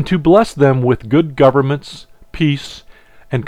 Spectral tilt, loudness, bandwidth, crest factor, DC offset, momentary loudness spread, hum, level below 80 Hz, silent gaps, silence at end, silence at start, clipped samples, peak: -7.5 dB/octave; -14 LUFS; 11 kHz; 14 dB; 0.4%; 12 LU; none; -40 dBFS; none; 0 s; 0 s; under 0.1%; 0 dBFS